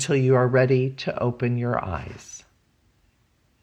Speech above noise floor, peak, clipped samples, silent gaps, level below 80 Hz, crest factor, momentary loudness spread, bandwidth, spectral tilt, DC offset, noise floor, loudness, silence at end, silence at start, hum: 43 dB; -8 dBFS; under 0.1%; none; -54 dBFS; 16 dB; 21 LU; 9.2 kHz; -6.5 dB/octave; under 0.1%; -65 dBFS; -23 LUFS; 1.25 s; 0 s; none